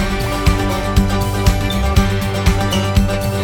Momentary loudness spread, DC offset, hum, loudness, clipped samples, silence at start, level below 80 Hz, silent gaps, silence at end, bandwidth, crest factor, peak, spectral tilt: 2 LU; under 0.1%; none; -16 LUFS; under 0.1%; 0 s; -20 dBFS; none; 0 s; 19 kHz; 14 dB; 0 dBFS; -5.5 dB/octave